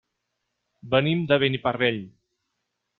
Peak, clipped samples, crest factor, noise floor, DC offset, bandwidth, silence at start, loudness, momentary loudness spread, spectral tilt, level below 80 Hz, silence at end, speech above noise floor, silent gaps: -6 dBFS; under 0.1%; 20 dB; -79 dBFS; under 0.1%; 4.4 kHz; 0.85 s; -23 LUFS; 4 LU; -9 dB/octave; -62 dBFS; 0.9 s; 56 dB; none